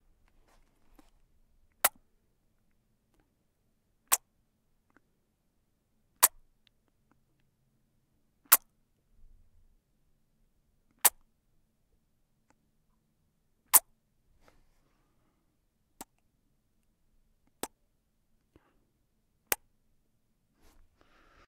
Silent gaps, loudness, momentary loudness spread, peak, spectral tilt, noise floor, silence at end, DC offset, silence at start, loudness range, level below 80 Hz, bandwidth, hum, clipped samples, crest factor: none; -27 LUFS; 19 LU; 0 dBFS; 2 dB/octave; -75 dBFS; 1.9 s; under 0.1%; 1.85 s; 21 LU; -70 dBFS; 15.5 kHz; none; under 0.1%; 38 dB